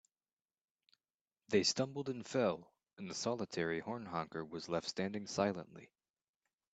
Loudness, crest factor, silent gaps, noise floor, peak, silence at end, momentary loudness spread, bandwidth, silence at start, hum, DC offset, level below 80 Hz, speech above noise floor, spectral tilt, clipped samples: -39 LUFS; 22 dB; none; under -90 dBFS; -18 dBFS; 0.9 s; 12 LU; 9 kHz; 1.5 s; none; under 0.1%; -78 dBFS; over 51 dB; -4 dB/octave; under 0.1%